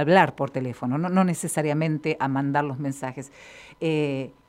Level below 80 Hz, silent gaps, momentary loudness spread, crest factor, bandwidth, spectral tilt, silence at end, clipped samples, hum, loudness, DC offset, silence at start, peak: -66 dBFS; none; 12 LU; 22 dB; 15.5 kHz; -6 dB/octave; 0.2 s; under 0.1%; none; -25 LUFS; under 0.1%; 0 s; -2 dBFS